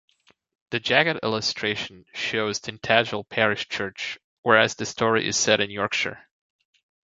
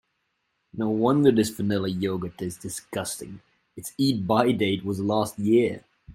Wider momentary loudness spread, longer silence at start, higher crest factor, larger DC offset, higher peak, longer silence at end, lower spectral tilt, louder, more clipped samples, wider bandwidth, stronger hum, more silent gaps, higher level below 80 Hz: second, 10 LU vs 16 LU; about the same, 0.7 s vs 0.75 s; about the same, 24 dB vs 20 dB; neither; about the same, -2 dBFS vs -4 dBFS; first, 0.85 s vs 0.05 s; second, -2.5 dB/octave vs -5.5 dB/octave; about the same, -23 LUFS vs -25 LUFS; neither; second, 7.8 kHz vs 16.5 kHz; neither; first, 4.24-4.43 s vs none; about the same, -62 dBFS vs -60 dBFS